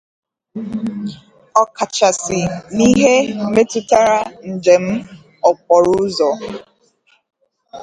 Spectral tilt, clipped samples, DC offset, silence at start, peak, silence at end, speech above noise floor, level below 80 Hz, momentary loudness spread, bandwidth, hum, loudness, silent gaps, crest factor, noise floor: -4.5 dB/octave; under 0.1%; under 0.1%; 0.55 s; 0 dBFS; 0 s; 42 dB; -50 dBFS; 14 LU; 11 kHz; none; -15 LUFS; none; 16 dB; -57 dBFS